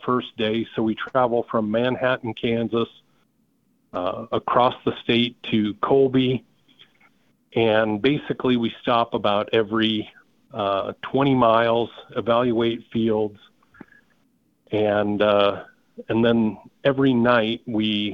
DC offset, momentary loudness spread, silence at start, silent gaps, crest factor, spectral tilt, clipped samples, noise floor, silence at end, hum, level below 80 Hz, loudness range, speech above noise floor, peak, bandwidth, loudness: under 0.1%; 9 LU; 0 s; none; 18 dB; -8 dB/octave; under 0.1%; -66 dBFS; 0 s; none; -58 dBFS; 3 LU; 44 dB; -4 dBFS; 6 kHz; -22 LUFS